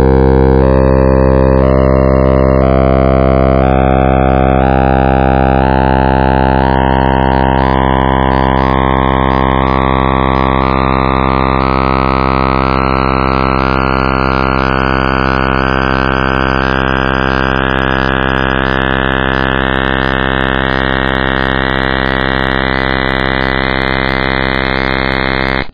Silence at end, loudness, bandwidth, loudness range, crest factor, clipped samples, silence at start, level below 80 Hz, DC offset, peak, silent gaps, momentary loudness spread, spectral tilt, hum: 0 s; -11 LUFS; 5.4 kHz; 3 LU; 10 dB; 0.3%; 0 s; -18 dBFS; 5%; 0 dBFS; none; 3 LU; -8.5 dB/octave; none